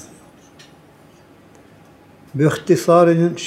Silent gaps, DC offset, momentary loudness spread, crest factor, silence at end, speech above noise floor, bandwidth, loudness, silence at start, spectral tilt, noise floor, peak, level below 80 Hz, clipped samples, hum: none; under 0.1%; 7 LU; 18 dB; 0 s; 33 dB; 14 kHz; -15 LUFS; 2.35 s; -6.5 dB/octave; -47 dBFS; -2 dBFS; -62 dBFS; under 0.1%; none